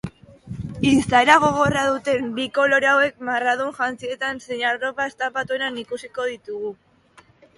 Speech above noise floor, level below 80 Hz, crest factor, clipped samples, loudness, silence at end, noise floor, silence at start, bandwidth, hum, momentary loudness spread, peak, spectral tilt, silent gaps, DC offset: 33 dB; -50 dBFS; 22 dB; under 0.1%; -20 LUFS; 0.85 s; -54 dBFS; 0.05 s; 11.5 kHz; none; 16 LU; 0 dBFS; -4.5 dB/octave; none; under 0.1%